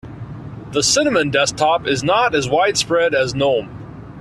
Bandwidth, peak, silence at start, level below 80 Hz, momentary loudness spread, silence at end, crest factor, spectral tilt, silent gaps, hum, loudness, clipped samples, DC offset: 13.5 kHz; -2 dBFS; 0.05 s; -46 dBFS; 18 LU; 0 s; 16 dB; -3 dB/octave; none; none; -16 LUFS; under 0.1%; under 0.1%